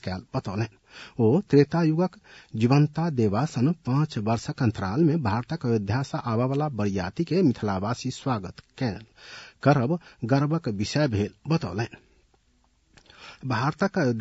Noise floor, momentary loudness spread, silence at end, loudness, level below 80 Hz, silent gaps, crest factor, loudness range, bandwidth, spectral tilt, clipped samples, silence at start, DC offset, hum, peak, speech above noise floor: -65 dBFS; 10 LU; 0 s; -26 LUFS; -60 dBFS; none; 20 dB; 5 LU; 8 kHz; -7.5 dB/octave; under 0.1%; 0.05 s; under 0.1%; none; -6 dBFS; 40 dB